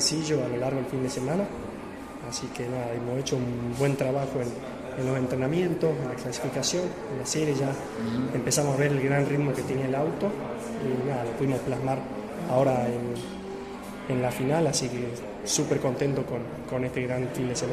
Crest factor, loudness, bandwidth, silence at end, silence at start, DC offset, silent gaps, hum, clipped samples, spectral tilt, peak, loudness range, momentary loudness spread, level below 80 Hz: 18 dB; -28 LUFS; 14.5 kHz; 0 s; 0 s; under 0.1%; none; none; under 0.1%; -5 dB/octave; -10 dBFS; 3 LU; 10 LU; -54 dBFS